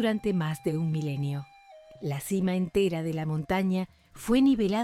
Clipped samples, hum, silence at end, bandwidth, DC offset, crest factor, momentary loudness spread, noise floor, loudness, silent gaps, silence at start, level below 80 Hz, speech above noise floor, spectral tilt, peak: under 0.1%; none; 0 s; 15.5 kHz; under 0.1%; 14 dB; 14 LU; -52 dBFS; -28 LUFS; none; 0 s; -54 dBFS; 25 dB; -7 dB/octave; -14 dBFS